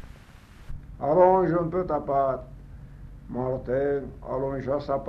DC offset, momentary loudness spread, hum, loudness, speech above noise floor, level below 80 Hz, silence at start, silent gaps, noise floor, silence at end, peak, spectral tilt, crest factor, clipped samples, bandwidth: under 0.1%; 26 LU; none; -26 LUFS; 24 dB; -44 dBFS; 0 s; none; -48 dBFS; 0 s; -8 dBFS; -9.5 dB/octave; 20 dB; under 0.1%; 6 kHz